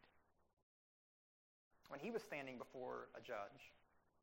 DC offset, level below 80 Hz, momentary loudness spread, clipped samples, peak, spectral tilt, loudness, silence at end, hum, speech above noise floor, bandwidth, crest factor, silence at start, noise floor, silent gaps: under 0.1%; -86 dBFS; 10 LU; under 0.1%; -34 dBFS; -5 dB/octave; -52 LUFS; 0.35 s; none; 26 dB; 16 kHz; 20 dB; 0.05 s; -77 dBFS; 0.53-0.57 s, 0.63-1.71 s